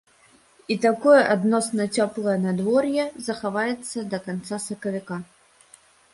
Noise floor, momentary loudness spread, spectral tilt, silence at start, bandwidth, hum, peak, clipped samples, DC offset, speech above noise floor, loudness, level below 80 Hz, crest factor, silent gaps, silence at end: -57 dBFS; 14 LU; -5 dB/octave; 0.7 s; 11.5 kHz; none; -4 dBFS; under 0.1%; under 0.1%; 34 dB; -23 LUFS; -66 dBFS; 20 dB; none; 0.9 s